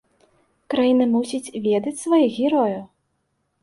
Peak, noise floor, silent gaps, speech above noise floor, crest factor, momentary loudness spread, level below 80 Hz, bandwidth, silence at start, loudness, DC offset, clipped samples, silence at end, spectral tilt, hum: -8 dBFS; -72 dBFS; none; 52 dB; 14 dB; 8 LU; -66 dBFS; 11.5 kHz; 0.7 s; -20 LUFS; under 0.1%; under 0.1%; 0.75 s; -5.5 dB/octave; none